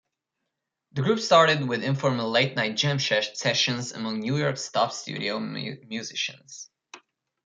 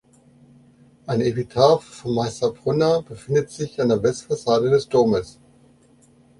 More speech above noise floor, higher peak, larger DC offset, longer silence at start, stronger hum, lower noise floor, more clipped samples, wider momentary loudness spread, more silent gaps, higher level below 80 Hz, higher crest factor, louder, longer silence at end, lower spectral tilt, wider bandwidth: first, 57 dB vs 34 dB; second, -6 dBFS vs -2 dBFS; neither; second, 0.95 s vs 1.1 s; neither; first, -83 dBFS vs -54 dBFS; neither; first, 15 LU vs 9 LU; neither; second, -70 dBFS vs -54 dBFS; about the same, 22 dB vs 20 dB; second, -25 LUFS vs -21 LUFS; second, 0.5 s vs 1.1 s; second, -4 dB/octave vs -6 dB/octave; second, 9.4 kHz vs 11.5 kHz